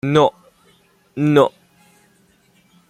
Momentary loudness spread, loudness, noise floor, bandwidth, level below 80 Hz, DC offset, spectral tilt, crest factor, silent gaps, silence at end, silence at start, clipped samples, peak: 8 LU; -17 LUFS; -57 dBFS; 13 kHz; -60 dBFS; under 0.1%; -7 dB/octave; 18 dB; none; 1.4 s; 0.05 s; under 0.1%; -2 dBFS